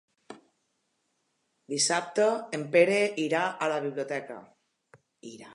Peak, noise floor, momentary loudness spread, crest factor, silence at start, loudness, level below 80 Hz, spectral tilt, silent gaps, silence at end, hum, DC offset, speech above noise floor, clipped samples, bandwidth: -8 dBFS; -76 dBFS; 20 LU; 22 dB; 0.3 s; -27 LUFS; -84 dBFS; -3 dB/octave; none; 0.05 s; none; under 0.1%; 49 dB; under 0.1%; 11.5 kHz